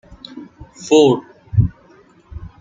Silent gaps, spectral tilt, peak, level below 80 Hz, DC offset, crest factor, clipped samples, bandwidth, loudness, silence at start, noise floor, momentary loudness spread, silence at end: none; -6.5 dB/octave; 0 dBFS; -38 dBFS; under 0.1%; 18 dB; under 0.1%; 9.4 kHz; -16 LUFS; 0.35 s; -49 dBFS; 25 LU; 0.15 s